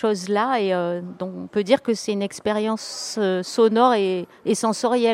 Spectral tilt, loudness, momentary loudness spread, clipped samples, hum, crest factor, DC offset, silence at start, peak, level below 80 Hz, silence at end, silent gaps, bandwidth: -4.5 dB/octave; -22 LUFS; 10 LU; under 0.1%; none; 18 dB; under 0.1%; 0 s; -2 dBFS; -68 dBFS; 0 s; none; 15 kHz